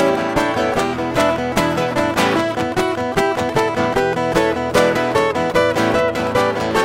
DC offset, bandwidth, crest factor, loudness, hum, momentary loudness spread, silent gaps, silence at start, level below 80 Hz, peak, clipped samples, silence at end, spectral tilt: under 0.1%; 16.5 kHz; 16 dB; -17 LUFS; none; 3 LU; none; 0 s; -40 dBFS; -2 dBFS; under 0.1%; 0 s; -5 dB/octave